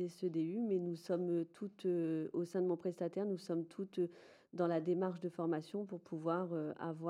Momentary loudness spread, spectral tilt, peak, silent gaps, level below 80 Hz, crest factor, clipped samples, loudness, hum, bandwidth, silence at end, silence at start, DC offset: 6 LU; -8 dB/octave; -22 dBFS; none; under -90 dBFS; 16 dB; under 0.1%; -40 LUFS; none; 11.5 kHz; 0 s; 0 s; under 0.1%